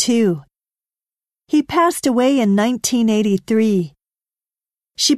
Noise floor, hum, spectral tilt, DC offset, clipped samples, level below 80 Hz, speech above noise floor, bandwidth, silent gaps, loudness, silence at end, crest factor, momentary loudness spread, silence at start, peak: under -90 dBFS; none; -4.5 dB/octave; under 0.1%; under 0.1%; -58 dBFS; over 74 dB; 13.5 kHz; none; -17 LUFS; 0 s; 14 dB; 6 LU; 0 s; -4 dBFS